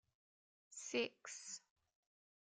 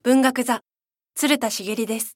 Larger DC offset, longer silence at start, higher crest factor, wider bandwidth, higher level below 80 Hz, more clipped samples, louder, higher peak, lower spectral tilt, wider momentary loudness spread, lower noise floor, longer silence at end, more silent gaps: neither; first, 0.7 s vs 0.05 s; about the same, 22 dB vs 20 dB; second, 10 kHz vs 17 kHz; second, under -90 dBFS vs -80 dBFS; neither; second, -46 LUFS vs -22 LUFS; second, -28 dBFS vs -4 dBFS; second, -1 dB/octave vs -2.5 dB/octave; first, 12 LU vs 8 LU; first, under -90 dBFS vs -46 dBFS; first, 0.9 s vs 0.05 s; neither